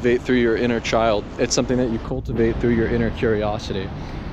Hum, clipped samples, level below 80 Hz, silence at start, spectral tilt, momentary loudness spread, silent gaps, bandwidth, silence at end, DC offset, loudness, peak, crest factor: none; under 0.1%; -34 dBFS; 0 s; -5.5 dB/octave; 8 LU; none; 10 kHz; 0 s; under 0.1%; -21 LUFS; -6 dBFS; 14 dB